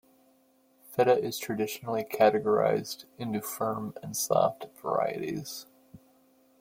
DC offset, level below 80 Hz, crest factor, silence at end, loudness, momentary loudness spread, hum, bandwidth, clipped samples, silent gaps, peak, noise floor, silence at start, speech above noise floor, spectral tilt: under 0.1%; -70 dBFS; 20 dB; 0.65 s; -29 LUFS; 13 LU; none; 16.5 kHz; under 0.1%; none; -10 dBFS; -65 dBFS; 0.9 s; 37 dB; -4.5 dB/octave